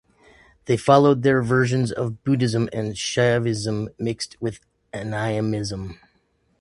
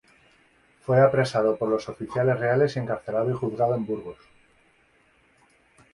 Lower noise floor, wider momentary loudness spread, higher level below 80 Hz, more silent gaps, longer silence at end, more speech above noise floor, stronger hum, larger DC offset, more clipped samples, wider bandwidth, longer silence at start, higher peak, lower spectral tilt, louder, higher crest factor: first, -66 dBFS vs -62 dBFS; about the same, 14 LU vs 12 LU; first, -52 dBFS vs -60 dBFS; neither; second, 0.65 s vs 1.8 s; first, 44 dB vs 38 dB; neither; neither; neither; about the same, 11.5 kHz vs 11.5 kHz; second, 0.65 s vs 0.9 s; first, 0 dBFS vs -6 dBFS; second, -6 dB/octave vs -7.5 dB/octave; about the same, -22 LUFS vs -24 LUFS; about the same, 22 dB vs 20 dB